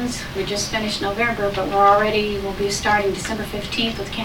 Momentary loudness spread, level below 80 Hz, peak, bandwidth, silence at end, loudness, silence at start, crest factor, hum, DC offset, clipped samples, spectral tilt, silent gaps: 10 LU; -38 dBFS; -4 dBFS; 19 kHz; 0 s; -20 LUFS; 0 s; 18 dB; none; under 0.1%; under 0.1%; -3.5 dB/octave; none